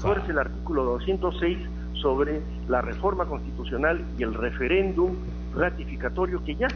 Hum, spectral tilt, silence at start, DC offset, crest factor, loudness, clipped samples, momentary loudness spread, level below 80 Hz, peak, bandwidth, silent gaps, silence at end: 60 Hz at -35 dBFS; -5 dB/octave; 0 s; under 0.1%; 16 dB; -27 LUFS; under 0.1%; 8 LU; -34 dBFS; -10 dBFS; 6.4 kHz; none; 0 s